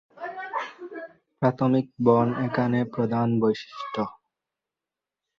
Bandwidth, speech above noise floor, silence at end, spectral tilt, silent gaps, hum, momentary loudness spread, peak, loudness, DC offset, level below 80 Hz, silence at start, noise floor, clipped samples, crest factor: 6.6 kHz; 65 dB; 1.25 s; -8.5 dB/octave; none; none; 16 LU; -4 dBFS; -25 LUFS; under 0.1%; -64 dBFS; 0.15 s; -89 dBFS; under 0.1%; 22 dB